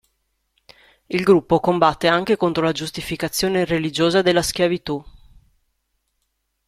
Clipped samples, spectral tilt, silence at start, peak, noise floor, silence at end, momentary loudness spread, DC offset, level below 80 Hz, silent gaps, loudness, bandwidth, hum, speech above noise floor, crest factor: under 0.1%; -4.5 dB/octave; 1.1 s; 0 dBFS; -73 dBFS; 1.6 s; 10 LU; under 0.1%; -48 dBFS; none; -19 LUFS; 15.5 kHz; none; 54 dB; 20 dB